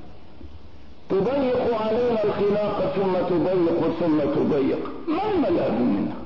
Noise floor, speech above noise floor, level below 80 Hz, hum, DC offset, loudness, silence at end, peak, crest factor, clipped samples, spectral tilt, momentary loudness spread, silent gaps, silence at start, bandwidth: -47 dBFS; 25 dB; -50 dBFS; none; 1%; -23 LUFS; 0 s; -12 dBFS; 10 dB; under 0.1%; -9 dB/octave; 3 LU; none; 0 s; 6 kHz